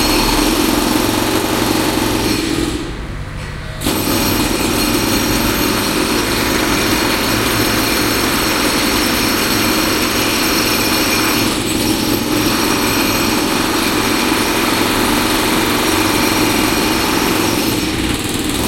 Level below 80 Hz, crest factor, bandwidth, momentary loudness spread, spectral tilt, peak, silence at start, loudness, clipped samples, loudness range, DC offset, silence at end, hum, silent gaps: -30 dBFS; 14 dB; 16.5 kHz; 4 LU; -3 dB/octave; -2 dBFS; 0 s; -14 LUFS; under 0.1%; 3 LU; under 0.1%; 0 s; none; none